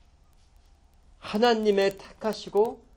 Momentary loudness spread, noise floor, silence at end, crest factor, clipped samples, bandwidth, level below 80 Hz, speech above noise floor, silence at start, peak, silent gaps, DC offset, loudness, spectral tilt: 11 LU; -58 dBFS; 0.2 s; 18 dB; under 0.1%; 17 kHz; -58 dBFS; 33 dB; 1.25 s; -10 dBFS; none; under 0.1%; -26 LUFS; -5 dB/octave